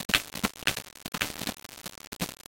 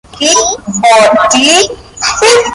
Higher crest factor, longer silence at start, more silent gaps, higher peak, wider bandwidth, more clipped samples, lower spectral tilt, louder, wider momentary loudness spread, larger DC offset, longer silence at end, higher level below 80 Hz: first, 32 dB vs 8 dB; second, 0 s vs 0.15 s; first, 0.05-0.09 s, 2.07-2.12 s vs none; about the same, -2 dBFS vs 0 dBFS; about the same, 17 kHz vs 16 kHz; second, under 0.1% vs 0.2%; about the same, -2 dB/octave vs -1 dB/octave; second, -32 LUFS vs -7 LUFS; first, 14 LU vs 8 LU; neither; first, 0.15 s vs 0 s; second, -54 dBFS vs -40 dBFS